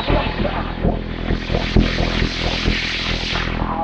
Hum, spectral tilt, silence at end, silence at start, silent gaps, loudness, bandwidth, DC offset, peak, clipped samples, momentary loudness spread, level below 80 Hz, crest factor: none; -5.5 dB/octave; 0 s; 0 s; none; -20 LUFS; 7.8 kHz; under 0.1%; 0 dBFS; under 0.1%; 5 LU; -24 dBFS; 18 dB